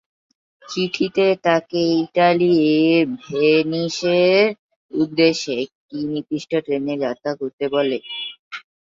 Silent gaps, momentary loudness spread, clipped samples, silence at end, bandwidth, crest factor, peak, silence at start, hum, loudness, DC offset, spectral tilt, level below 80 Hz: 4.59-4.69 s, 4.76-4.89 s, 5.75-5.89 s, 7.53-7.58 s, 8.39-8.51 s; 13 LU; under 0.1%; 0.2 s; 7.6 kHz; 18 dB; -2 dBFS; 0.65 s; none; -19 LUFS; under 0.1%; -5.5 dB/octave; -64 dBFS